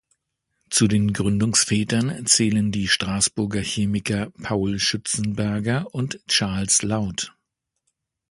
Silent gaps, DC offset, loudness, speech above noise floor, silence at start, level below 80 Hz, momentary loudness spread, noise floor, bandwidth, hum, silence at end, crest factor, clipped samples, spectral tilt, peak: none; under 0.1%; -21 LUFS; 57 dB; 0.7 s; -48 dBFS; 8 LU; -79 dBFS; 11.5 kHz; none; 1 s; 20 dB; under 0.1%; -3.5 dB/octave; -2 dBFS